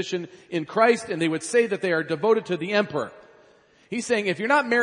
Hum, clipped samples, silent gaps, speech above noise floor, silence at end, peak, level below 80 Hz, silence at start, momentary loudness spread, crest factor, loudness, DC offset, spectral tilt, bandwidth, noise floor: none; under 0.1%; none; 33 dB; 0 s; -4 dBFS; -74 dBFS; 0 s; 11 LU; 20 dB; -24 LUFS; under 0.1%; -4.5 dB/octave; 10.5 kHz; -56 dBFS